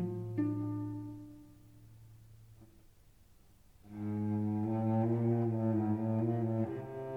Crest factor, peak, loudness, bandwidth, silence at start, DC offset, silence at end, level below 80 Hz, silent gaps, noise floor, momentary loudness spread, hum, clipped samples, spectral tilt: 16 dB; -20 dBFS; -35 LUFS; 3.6 kHz; 0 s; under 0.1%; 0 s; -66 dBFS; none; -63 dBFS; 14 LU; none; under 0.1%; -11 dB/octave